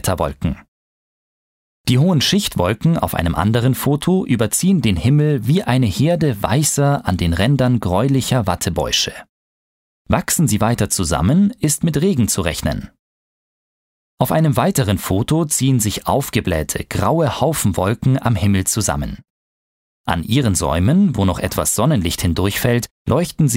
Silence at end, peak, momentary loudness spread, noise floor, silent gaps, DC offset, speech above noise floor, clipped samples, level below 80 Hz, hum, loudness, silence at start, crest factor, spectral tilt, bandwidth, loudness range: 0 s; 0 dBFS; 5 LU; under -90 dBFS; 0.68-1.84 s, 9.29-10.05 s, 12.99-14.18 s, 19.30-20.04 s, 22.91-23.05 s; under 0.1%; over 74 dB; under 0.1%; -36 dBFS; none; -17 LUFS; 0.05 s; 16 dB; -5 dB/octave; 16.5 kHz; 3 LU